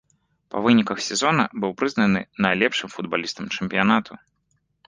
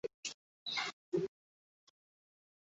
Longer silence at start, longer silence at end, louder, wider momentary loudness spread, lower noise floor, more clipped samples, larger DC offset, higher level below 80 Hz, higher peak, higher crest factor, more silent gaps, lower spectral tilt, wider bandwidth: first, 0.55 s vs 0.05 s; second, 0.7 s vs 1.5 s; first, -22 LUFS vs -41 LUFS; about the same, 8 LU vs 7 LU; second, -70 dBFS vs under -90 dBFS; neither; neither; first, -58 dBFS vs -82 dBFS; first, -2 dBFS vs -24 dBFS; about the same, 20 dB vs 20 dB; second, none vs 0.14-0.23 s, 0.34-0.66 s, 0.93-1.12 s; first, -4.5 dB/octave vs -2 dB/octave; first, 10 kHz vs 8 kHz